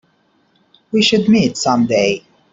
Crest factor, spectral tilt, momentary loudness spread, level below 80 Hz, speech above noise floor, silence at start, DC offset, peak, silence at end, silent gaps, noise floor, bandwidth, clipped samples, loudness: 14 dB; -4.5 dB/octave; 7 LU; -52 dBFS; 45 dB; 0.95 s; under 0.1%; -2 dBFS; 0.35 s; none; -59 dBFS; 7.8 kHz; under 0.1%; -15 LUFS